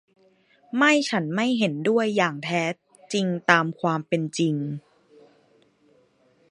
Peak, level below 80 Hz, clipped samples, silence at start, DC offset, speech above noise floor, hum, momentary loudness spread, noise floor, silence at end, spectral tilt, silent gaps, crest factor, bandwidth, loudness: 0 dBFS; -74 dBFS; under 0.1%; 0.75 s; under 0.1%; 39 dB; none; 10 LU; -62 dBFS; 1.7 s; -5 dB/octave; none; 26 dB; 11 kHz; -23 LUFS